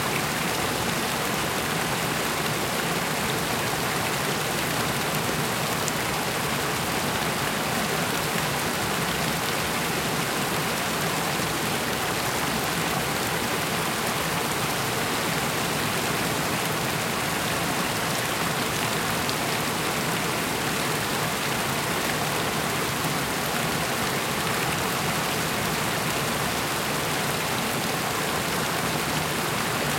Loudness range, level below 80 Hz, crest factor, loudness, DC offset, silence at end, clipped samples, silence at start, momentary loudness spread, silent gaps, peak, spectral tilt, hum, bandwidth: 0 LU; -50 dBFS; 22 dB; -25 LUFS; under 0.1%; 0 s; under 0.1%; 0 s; 1 LU; none; -4 dBFS; -3 dB/octave; none; 17 kHz